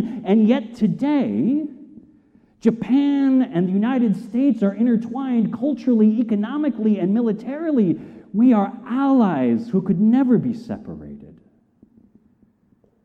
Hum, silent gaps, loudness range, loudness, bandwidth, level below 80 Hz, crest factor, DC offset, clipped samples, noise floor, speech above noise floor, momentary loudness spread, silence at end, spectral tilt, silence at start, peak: none; none; 2 LU; -19 LUFS; 5.8 kHz; -60 dBFS; 14 dB; under 0.1%; under 0.1%; -60 dBFS; 41 dB; 8 LU; 1.75 s; -9.5 dB/octave; 0 s; -4 dBFS